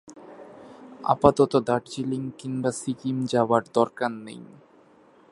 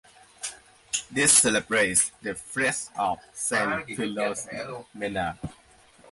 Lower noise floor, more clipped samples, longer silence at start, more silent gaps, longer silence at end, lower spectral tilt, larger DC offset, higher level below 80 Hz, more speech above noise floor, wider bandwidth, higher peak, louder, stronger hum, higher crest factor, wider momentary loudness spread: about the same, -56 dBFS vs -55 dBFS; neither; second, 0.05 s vs 0.4 s; neither; first, 0.9 s vs 0 s; first, -6 dB/octave vs -2 dB/octave; neither; about the same, -58 dBFS vs -58 dBFS; about the same, 31 dB vs 29 dB; about the same, 11.5 kHz vs 12 kHz; first, -2 dBFS vs -6 dBFS; about the same, -25 LUFS vs -24 LUFS; neither; about the same, 24 dB vs 22 dB; first, 25 LU vs 19 LU